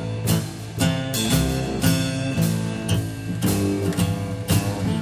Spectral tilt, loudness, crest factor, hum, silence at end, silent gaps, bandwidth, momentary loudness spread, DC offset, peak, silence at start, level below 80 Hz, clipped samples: -5 dB/octave; -23 LUFS; 16 dB; none; 0 s; none; 16 kHz; 4 LU; under 0.1%; -6 dBFS; 0 s; -38 dBFS; under 0.1%